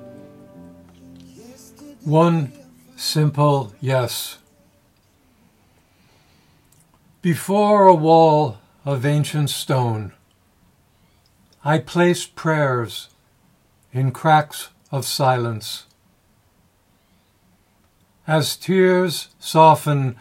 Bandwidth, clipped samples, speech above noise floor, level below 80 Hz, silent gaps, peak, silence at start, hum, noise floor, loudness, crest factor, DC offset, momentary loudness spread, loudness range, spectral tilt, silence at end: 16 kHz; under 0.1%; 42 dB; -66 dBFS; none; 0 dBFS; 0 s; none; -60 dBFS; -18 LUFS; 20 dB; under 0.1%; 17 LU; 10 LU; -6 dB/octave; 0.05 s